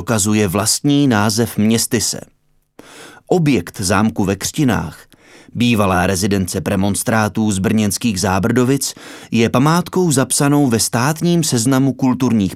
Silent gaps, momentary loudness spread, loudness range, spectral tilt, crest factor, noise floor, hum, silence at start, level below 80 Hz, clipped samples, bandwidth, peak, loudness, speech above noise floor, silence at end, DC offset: none; 5 LU; 3 LU; -4.5 dB/octave; 16 dB; -47 dBFS; none; 0 s; -48 dBFS; under 0.1%; 16 kHz; 0 dBFS; -15 LUFS; 32 dB; 0 s; 0.1%